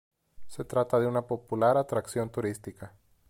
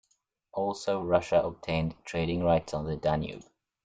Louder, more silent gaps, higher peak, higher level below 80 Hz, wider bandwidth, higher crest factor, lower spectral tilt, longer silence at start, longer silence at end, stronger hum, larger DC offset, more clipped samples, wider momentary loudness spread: about the same, -29 LUFS vs -30 LUFS; neither; about the same, -12 dBFS vs -10 dBFS; second, -62 dBFS vs -52 dBFS; first, 16.5 kHz vs 9.2 kHz; about the same, 18 dB vs 20 dB; about the same, -6.5 dB/octave vs -6.5 dB/octave; second, 0.4 s vs 0.55 s; about the same, 0.4 s vs 0.45 s; neither; neither; neither; first, 20 LU vs 8 LU